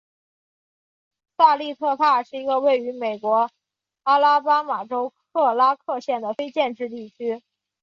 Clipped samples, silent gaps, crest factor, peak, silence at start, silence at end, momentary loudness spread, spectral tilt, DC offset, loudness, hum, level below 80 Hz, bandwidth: under 0.1%; none; 20 dB; -4 dBFS; 1.4 s; 0.45 s; 12 LU; -4.5 dB/octave; under 0.1%; -21 LUFS; none; -78 dBFS; 7.2 kHz